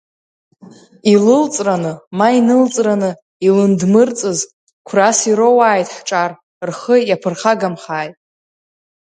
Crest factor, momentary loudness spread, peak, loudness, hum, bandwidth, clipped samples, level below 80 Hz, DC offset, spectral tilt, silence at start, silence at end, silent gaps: 14 dB; 12 LU; 0 dBFS; -14 LUFS; none; 9.6 kHz; under 0.1%; -64 dBFS; under 0.1%; -5 dB/octave; 1.05 s; 1.1 s; 2.07-2.11 s, 3.22-3.40 s, 4.53-4.67 s, 4.73-4.85 s, 6.43-6.61 s